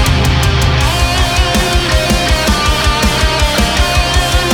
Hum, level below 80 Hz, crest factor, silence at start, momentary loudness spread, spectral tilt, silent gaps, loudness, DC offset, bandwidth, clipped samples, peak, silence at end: none; -16 dBFS; 12 dB; 0 s; 1 LU; -4 dB/octave; none; -12 LUFS; under 0.1%; over 20 kHz; under 0.1%; 0 dBFS; 0 s